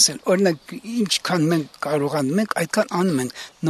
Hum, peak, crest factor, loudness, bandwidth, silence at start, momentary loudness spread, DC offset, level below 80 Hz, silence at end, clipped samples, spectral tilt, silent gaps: none; -2 dBFS; 20 dB; -21 LUFS; 13.5 kHz; 0 s; 6 LU; under 0.1%; -64 dBFS; 0 s; under 0.1%; -4 dB/octave; none